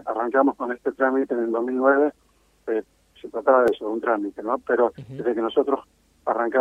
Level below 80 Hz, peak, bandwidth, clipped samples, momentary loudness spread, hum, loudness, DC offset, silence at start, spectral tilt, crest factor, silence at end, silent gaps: -64 dBFS; -4 dBFS; 9.6 kHz; under 0.1%; 10 LU; none; -23 LUFS; under 0.1%; 0.05 s; -7 dB/octave; 18 dB; 0 s; none